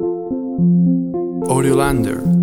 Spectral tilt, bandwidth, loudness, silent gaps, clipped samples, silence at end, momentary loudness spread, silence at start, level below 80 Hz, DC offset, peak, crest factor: -7.5 dB/octave; 13.5 kHz; -17 LUFS; none; under 0.1%; 0 s; 8 LU; 0 s; -36 dBFS; under 0.1%; -2 dBFS; 14 dB